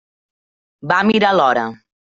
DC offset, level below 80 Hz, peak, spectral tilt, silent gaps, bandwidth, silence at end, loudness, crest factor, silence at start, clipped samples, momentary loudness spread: under 0.1%; -60 dBFS; -2 dBFS; -5.5 dB/octave; none; 7.8 kHz; 0.35 s; -15 LUFS; 16 dB; 0.85 s; under 0.1%; 14 LU